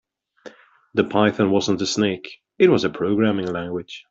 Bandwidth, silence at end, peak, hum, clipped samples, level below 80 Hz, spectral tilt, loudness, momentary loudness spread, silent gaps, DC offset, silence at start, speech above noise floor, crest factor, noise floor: 7.8 kHz; 0.1 s; -4 dBFS; none; under 0.1%; -60 dBFS; -5.5 dB/octave; -20 LUFS; 12 LU; none; under 0.1%; 0.45 s; 26 dB; 18 dB; -45 dBFS